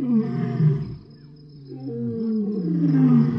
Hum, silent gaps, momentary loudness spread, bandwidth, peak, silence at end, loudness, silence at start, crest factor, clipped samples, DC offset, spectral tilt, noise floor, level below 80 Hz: none; none; 18 LU; 5.6 kHz; -8 dBFS; 0 s; -22 LUFS; 0 s; 14 dB; under 0.1%; under 0.1%; -11.5 dB/octave; -45 dBFS; -56 dBFS